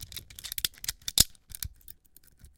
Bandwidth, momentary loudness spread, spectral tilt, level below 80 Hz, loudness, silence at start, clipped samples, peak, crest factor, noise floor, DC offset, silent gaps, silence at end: 17 kHz; 20 LU; -0.5 dB/octave; -48 dBFS; -29 LUFS; 0 s; under 0.1%; -2 dBFS; 32 dB; -59 dBFS; under 0.1%; none; 0.1 s